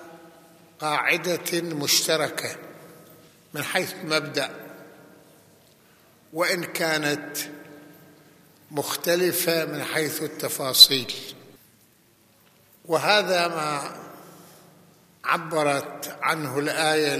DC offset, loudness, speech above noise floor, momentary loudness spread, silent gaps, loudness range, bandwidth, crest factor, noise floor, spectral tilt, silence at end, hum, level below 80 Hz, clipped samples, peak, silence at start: under 0.1%; -23 LUFS; 35 dB; 16 LU; none; 9 LU; 15 kHz; 26 dB; -59 dBFS; -2 dB/octave; 0 s; none; -74 dBFS; under 0.1%; 0 dBFS; 0 s